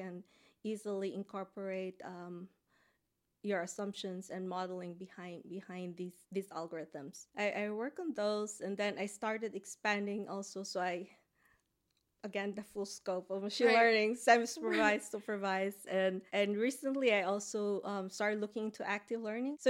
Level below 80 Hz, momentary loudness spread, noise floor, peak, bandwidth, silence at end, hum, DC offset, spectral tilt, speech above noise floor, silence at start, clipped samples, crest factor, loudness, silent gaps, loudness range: -84 dBFS; 16 LU; -83 dBFS; -14 dBFS; 16.5 kHz; 0 s; none; under 0.1%; -4 dB/octave; 46 dB; 0 s; under 0.1%; 24 dB; -36 LUFS; none; 11 LU